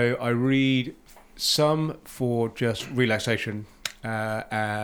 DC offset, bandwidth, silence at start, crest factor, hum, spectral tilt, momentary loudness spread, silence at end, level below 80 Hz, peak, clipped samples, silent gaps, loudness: under 0.1%; 20 kHz; 0 s; 20 dB; none; -5 dB/octave; 11 LU; 0 s; -56 dBFS; -6 dBFS; under 0.1%; none; -25 LUFS